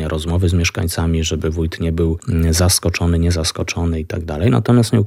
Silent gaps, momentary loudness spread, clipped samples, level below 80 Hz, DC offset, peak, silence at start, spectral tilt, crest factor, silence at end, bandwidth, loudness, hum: none; 7 LU; under 0.1%; -28 dBFS; under 0.1%; -4 dBFS; 0 s; -5 dB/octave; 12 dB; 0 s; 16 kHz; -17 LUFS; none